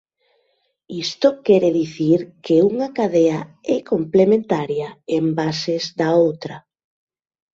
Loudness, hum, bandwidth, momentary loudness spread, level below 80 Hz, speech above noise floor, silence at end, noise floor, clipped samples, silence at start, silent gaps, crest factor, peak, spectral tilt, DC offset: -19 LUFS; none; 7.8 kHz; 11 LU; -62 dBFS; 49 dB; 0.95 s; -67 dBFS; under 0.1%; 0.9 s; none; 18 dB; -2 dBFS; -6.5 dB/octave; under 0.1%